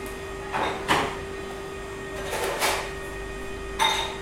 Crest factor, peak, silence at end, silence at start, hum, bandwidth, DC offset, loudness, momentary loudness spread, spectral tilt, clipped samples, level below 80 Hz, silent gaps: 22 dB; -6 dBFS; 0 s; 0 s; none; 16.5 kHz; under 0.1%; -28 LUFS; 12 LU; -2.5 dB/octave; under 0.1%; -44 dBFS; none